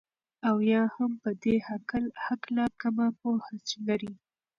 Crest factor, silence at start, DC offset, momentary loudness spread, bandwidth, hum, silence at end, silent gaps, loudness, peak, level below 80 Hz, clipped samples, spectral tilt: 16 dB; 0.45 s; under 0.1%; 8 LU; 7.4 kHz; none; 0.45 s; none; -30 LUFS; -14 dBFS; -64 dBFS; under 0.1%; -6 dB/octave